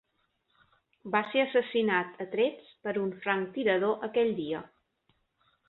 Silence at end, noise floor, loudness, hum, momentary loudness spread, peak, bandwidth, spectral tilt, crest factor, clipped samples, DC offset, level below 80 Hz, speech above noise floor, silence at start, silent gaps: 1 s; -76 dBFS; -30 LUFS; none; 8 LU; -12 dBFS; 4.2 kHz; -8.5 dB/octave; 18 dB; under 0.1%; under 0.1%; -74 dBFS; 47 dB; 1.05 s; none